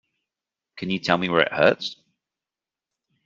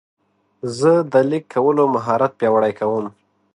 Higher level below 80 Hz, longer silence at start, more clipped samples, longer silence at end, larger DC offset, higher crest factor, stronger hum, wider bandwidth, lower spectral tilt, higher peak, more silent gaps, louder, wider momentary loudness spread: about the same, -66 dBFS vs -64 dBFS; about the same, 0.75 s vs 0.65 s; neither; first, 1.35 s vs 0.45 s; neither; first, 24 dB vs 16 dB; neither; second, 7.6 kHz vs 11 kHz; second, -5.5 dB/octave vs -7 dB/octave; about the same, -2 dBFS vs -2 dBFS; neither; second, -21 LUFS vs -18 LUFS; about the same, 13 LU vs 11 LU